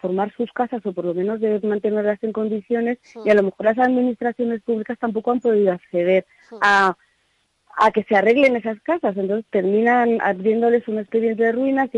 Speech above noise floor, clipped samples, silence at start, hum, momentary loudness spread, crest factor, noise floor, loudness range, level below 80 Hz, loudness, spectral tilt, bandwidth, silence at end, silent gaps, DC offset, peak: 47 dB; under 0.1%; 0.05 s; none; 8 LU; 14 dB; -66 dBFS; 2 LU; -64 dBFS; -20 LUFS; -6.5 dB/octave; 10.5 kHz; 0 s; none; under 0.1%; -6 dBFS